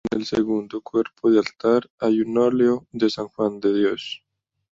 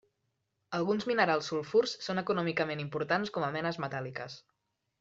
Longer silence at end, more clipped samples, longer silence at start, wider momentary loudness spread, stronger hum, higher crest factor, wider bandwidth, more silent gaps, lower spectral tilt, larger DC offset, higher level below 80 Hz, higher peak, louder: about the same, 0.6 s vs 0.6 s; neither; second, 0.05 s vs 0.7 s; second, 6 LU vs 11 LU; neither; second, 16 dB vs 22 dB; about the same, 7.6 kHz vs 7.8 kHz; first, 1.90-1.98 s vs none; about the same, -6 dB/octave vs -5.5 dB/octave; neither; first, -60 dBFS vs -72 dBFS; first, -6 dBFS vs -12 dBFS; first, -22 LUFS vs -32 LUFS